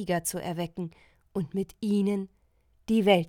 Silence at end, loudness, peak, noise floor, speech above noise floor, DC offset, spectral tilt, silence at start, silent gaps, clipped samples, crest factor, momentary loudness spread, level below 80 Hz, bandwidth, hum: 0 s; -30 LUFS; -8 dBFS; -66 dBFS; 38 dB; under 0.1%; -5.5 dB/octave; 0 s; none; under 0.1%; 20 dB; 14 LU; -60 dBFS; over 20 kHz; none